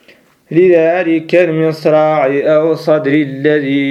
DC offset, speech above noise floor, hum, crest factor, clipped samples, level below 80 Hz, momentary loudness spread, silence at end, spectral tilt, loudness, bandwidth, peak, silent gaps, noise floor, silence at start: under 0.1%; 36 dB; none; 12 dB; under 0.1%; -62 dBFS; 4 LU; 0 s; -8 dB/octave; -12 LUFS; 12.5 kHz; 0 dBFS; none; -47 dBFS; 0.5 s